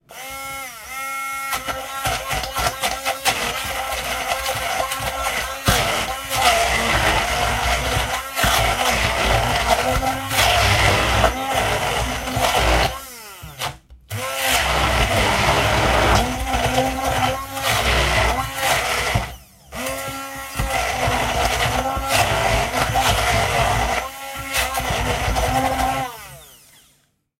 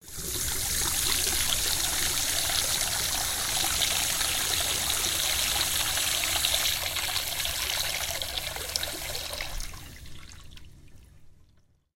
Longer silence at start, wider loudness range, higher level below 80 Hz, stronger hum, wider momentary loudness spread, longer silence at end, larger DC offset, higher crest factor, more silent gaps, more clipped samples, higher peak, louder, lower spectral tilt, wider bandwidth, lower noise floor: about the same, 0.1 s vs 0.05 s; second, 4 LU vs 9 LU; first, -30 dBFS vs -44 dBFS; neither; first, 12 LU vs 9 LU; first, 0.85 s vs 0.5 s; neither; second, 18 dB vs 24 dB; neither; neither; about the same, -2 dBFS vs -4 dBFS; first, -19 LUFS vs -26 LUFS; first, -3 dB/octave vs 0 dB/octave; about the same, 16 kHz vs 17 kHz; about the same, -62 dBFS vs -62 dBFS